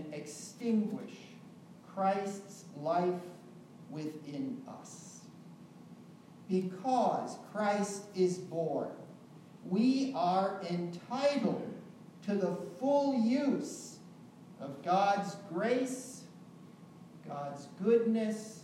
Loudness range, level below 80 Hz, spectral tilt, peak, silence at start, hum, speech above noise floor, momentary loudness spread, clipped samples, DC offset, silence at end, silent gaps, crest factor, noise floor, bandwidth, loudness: 6 LU; -88 dBFS; -6 dB/octave; -18 dBFS; 0 s; none; 21 dB; 24 LU; under 0.1%; under 0.1%; 0 s; none; 18 dB; -54 dBFS; 14 kHz; -34 LUFS